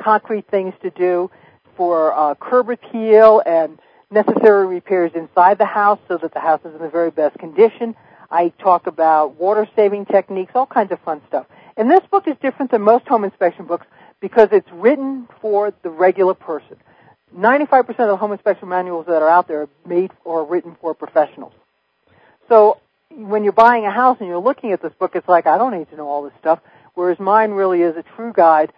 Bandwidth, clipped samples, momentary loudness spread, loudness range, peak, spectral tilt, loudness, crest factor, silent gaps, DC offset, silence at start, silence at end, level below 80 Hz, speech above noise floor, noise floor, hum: 5.2 kHz; under 0.1%; 13 LU; 4 LU; 0 dBFS; -8.5 dB/octave; -16 LUFS; 16 dB; none; under 0.1%; 0 s; 0.1 s; -66 dBFS; 47 dB; -62 dBFS; none